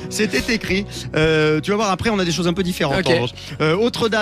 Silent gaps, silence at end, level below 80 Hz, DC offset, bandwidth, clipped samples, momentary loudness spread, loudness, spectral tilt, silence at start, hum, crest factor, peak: none; 0 s; -40 dBFS; under 0.1%; 14.5 kHz; under 0.1%; 5 LU; -19 LUFS; -5 dB/octave; 0 s; none; 16 dB; -4 dBFS